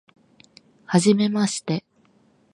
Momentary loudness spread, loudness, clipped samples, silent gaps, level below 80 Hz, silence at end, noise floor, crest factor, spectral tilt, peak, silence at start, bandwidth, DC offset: 10 LU; -21 LUFS; under 0.1%; none; -70 dBFS; 0.75 s; -60 dBFS; 20 dB; -5.5 dB/octave; -4 dBFS; 0.9 s; 11.5 kHz; under 0.1%